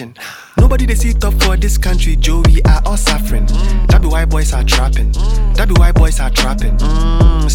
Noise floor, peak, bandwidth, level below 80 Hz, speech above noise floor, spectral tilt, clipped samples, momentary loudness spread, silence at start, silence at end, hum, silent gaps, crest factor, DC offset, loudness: -32 dBFS; 0 dBFS; 16 kHz; -10 dBFS; 22 dB; -5 dB/octave; under 0.1%; 5 LU; 0 s; 0 s; none; none; 10 dB; under 0.1%; -14 LUFS